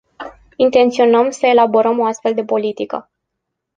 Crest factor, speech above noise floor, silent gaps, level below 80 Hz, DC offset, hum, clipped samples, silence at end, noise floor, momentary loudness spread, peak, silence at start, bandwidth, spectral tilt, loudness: 14 dB; 63 dB; none; -58 dBFS; under 0.1%; none; under 0.1%; 0.75 s; -77 dBFS; 17 LU; -2 dBFS; 0.2 s; 9.2 kHz; -4.5 dB/octave; -15 LUFS